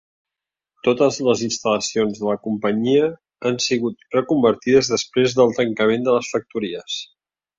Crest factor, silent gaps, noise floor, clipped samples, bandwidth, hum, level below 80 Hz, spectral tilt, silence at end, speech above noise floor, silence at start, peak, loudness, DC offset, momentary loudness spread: 18 dB; none; -87 dBFS; under 0.1%; 7.8 kHz; none; -60 dBFS; -4.5 dB/octave; 0.55 s; 68 dB; 0.85 s; -2 dBFS; -20 LUFS; under 0.1%; 9 LU